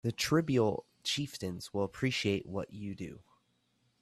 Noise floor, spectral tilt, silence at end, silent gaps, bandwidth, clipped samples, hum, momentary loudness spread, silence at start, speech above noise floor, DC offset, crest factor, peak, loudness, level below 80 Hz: -75 dBFS; -5 dB/octave; 0.8 s; none; 14.5 kHz; under 0.1%; none; 13 LU; 0.05 s; 41 dB; under 0.1%; 20 dB; -16 dBFS; -34 LUFS; -64 dBFS